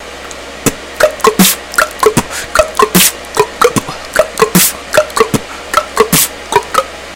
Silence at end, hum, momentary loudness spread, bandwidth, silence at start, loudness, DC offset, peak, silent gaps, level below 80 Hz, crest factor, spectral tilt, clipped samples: 0 s; none; 8 LU; over 20 kHz; 0 s; -11 LUFS; 0.5%; 0 dBFS; none; -36 dBFS; 12 dB; -3 dB/octave; 1%